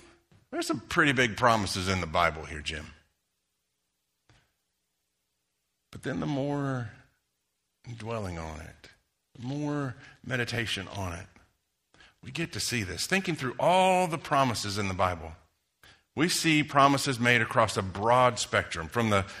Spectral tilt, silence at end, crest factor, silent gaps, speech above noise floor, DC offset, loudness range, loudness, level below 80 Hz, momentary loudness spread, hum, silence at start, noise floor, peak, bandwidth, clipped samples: -4.5 dB/octave; 0 s; 22 dB; none; 52 dB; under 0.1%; 13 LU; -27 LUFS; -56 dBFS; 16 LU; 60 Hz at -65 dBFS; 0.5 s; -80 dBFS; -6 dBFS; 15.5 kHz; under 0.1%